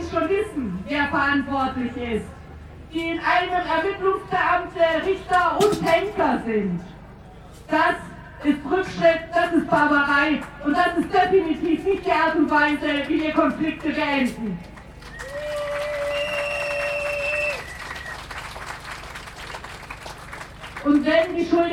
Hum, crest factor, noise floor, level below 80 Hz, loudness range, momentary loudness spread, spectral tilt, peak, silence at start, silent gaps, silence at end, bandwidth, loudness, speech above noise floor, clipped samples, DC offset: 50 Hz at -50 dBFS; 18 dB; -42 dBFS; -46 dBFS; 7 LU; 17 LU; -5.5 dB/octave; -6 dBFS; 0 s; none; 0 s; 15.5 kHz; -22 LUFS; 21 dB; under 0.1%; under 0.1%